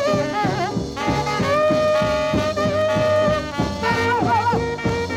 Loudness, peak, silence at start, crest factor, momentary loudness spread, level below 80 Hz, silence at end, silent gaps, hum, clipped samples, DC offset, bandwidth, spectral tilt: -20 LUFS; -8 dBFS; 0 s; 12 dB; 5 LU; -40 dBFS; 0 s; none; none; under 0.1%; under 0.1%; 15.5 kHz; -5.5 dB/octave